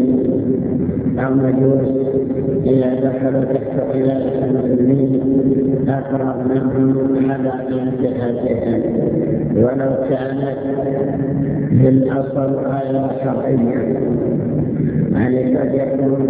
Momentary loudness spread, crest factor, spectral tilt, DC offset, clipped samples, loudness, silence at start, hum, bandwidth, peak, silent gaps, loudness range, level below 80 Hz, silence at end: 5 LU; 14 dB; -13.5 dB/octave; under 0.1%; under 0.1%; -17 LUFS; 0 s; none; 4 kHz; -2 dBFS; none; 2 LU; -42 dBFS; 0 s